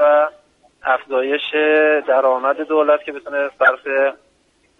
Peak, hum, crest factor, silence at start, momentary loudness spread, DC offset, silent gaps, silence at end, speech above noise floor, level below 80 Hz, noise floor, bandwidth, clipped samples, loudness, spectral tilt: -2 dBFS; none; 16 dB; 0 s; 8 LU; under 0.1%; none; 0.65 s; 43 dB; -66 dBFS; -59 dBFS; 4.2 kHz; under 0.1%; -17 LUFS; -4 dB/octave